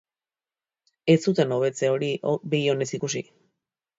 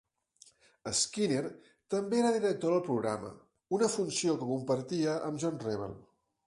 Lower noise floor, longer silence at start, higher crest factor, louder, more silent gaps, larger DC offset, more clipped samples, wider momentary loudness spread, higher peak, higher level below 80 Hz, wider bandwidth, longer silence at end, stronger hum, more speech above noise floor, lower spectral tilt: first, under -90 dBFS vs -63 dBFS; first, 1.05 s vs 0.85 s; about the same, 20 dB vs 16 dB; first, -24 LUFS vs -32 LUFS; neither; neither; neither; about the same, 9 LU vs 10 LU; first, -6 dBFS vs -16 dBFS; about the same, -70 dBFS vs -70 dBFS; second, 8 kHz vs 11.5 kHz; first, 0.75 s vs 0.45 s; neither; first, over 67 dB vs 31 dB; about the same, -5.5 dB/octave vs -4.5 dB/octave